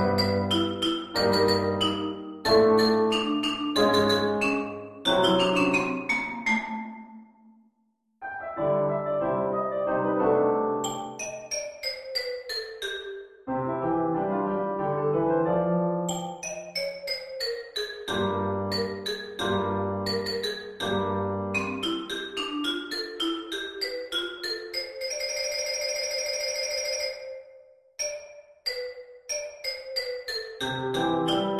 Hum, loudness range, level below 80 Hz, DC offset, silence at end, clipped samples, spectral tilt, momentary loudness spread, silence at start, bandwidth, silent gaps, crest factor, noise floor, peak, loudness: none; 7 LU; -56 dBFS; under 0.1%; 0 s; under 0.1%; -4 dB/octave; 11 LU; 0 s; 14.5 kHz; none; 20 dB; -72 dBFS; -8 dBFS; -27 LUFS